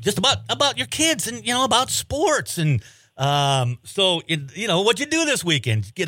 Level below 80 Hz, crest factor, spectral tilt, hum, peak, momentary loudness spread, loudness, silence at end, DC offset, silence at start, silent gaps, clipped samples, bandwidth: -52 dBFS; 18 dB; -3.5 dB/octave; none; -2 dBFS; 5 LU; -20 LUFS; 0 s; under 0.1%; 0 s; none; under 0.1%; 16.5 kHz